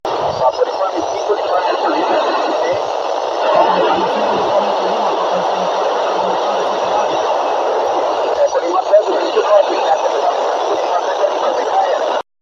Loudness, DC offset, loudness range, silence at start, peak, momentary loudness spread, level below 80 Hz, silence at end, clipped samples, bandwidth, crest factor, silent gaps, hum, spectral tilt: -15 LUFS; under 0.1%; 2 LU; 0.05 s; 0 dBFS; 5 LU; -58 dBFS; 0.2 s; under 0.1%; 7.6 kHz; 16 dB; none; none; -3.5 dB/octave